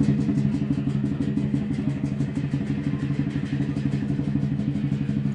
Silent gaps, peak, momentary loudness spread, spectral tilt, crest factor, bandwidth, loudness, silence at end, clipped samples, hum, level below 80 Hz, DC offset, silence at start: none; -8 dBFS; 3 LU; -9 dB/octave; 16 dB; 9 kHz; -26 LUFS; 0 s; under 0.1%; none; -46 dBFS; under 0.1%; 0 s